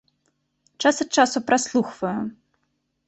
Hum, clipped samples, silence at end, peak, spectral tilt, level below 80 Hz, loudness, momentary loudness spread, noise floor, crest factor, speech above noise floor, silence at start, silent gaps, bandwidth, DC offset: none; under 0.1%; 0.75 s; -4 dBFS; -3 dB/octave; -66 dBFS; -22 LUFS; 9 LU; -73 dBFS; 20 dB; 52 dB; 0.8 s; none; 8.4 kHz; under 0.1%